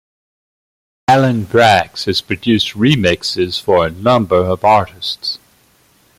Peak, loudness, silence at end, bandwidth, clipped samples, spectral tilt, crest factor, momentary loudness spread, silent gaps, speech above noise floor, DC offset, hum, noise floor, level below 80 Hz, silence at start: 0 dBFS; -14 LUFS; 0.8 s; 16 kHz; under 0.1%; -5.5 dB/octave; 14 dB; 9 LU; none; 39 dB; under 0.1%; none; -53 dBFS; -48 dBFS; 1.1 s